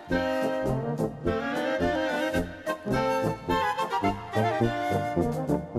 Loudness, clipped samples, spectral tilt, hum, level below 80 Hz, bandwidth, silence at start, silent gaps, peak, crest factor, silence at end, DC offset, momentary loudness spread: -28 LUFS; under 0.1%; -6.5 dB/octave; none; -46 dBFS; 15.5 kHz; 0 s; none; -12 dBFS; 16 dB; 0 s; under 0.1%; 3 LU